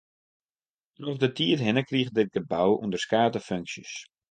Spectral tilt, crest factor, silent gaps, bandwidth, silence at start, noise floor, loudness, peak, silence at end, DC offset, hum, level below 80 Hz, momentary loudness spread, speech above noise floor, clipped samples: -5.5 dB/octave; 20 dB; none; 9.6 kHz; 1 s; under -90 dBFS; -26 LUFS; -8 dBFS; 0.3 s; under 0.1%; none; -64 dBFS; 12 LU; over 64 dB; under 0.1%